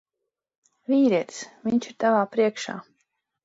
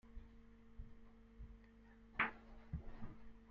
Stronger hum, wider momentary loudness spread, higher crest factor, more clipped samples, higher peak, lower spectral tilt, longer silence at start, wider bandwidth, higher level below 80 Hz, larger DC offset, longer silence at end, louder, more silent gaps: neither; second, 15 LU vs 24 LU; second, 16 dB vs 26 dB; neither; first, -10 dBFS vs -24 dBFS; first, -5 dB/octave vs -3.5 dB/octave; first, 0.9 s vs 0.05 s; first, 8 kHz vs 6.8 kHz; second, -72 dBFS vs -58 dBFS; neither; first, 0.65 s vs 0 s; first, -24 LUFS vs -46 LUFS; neither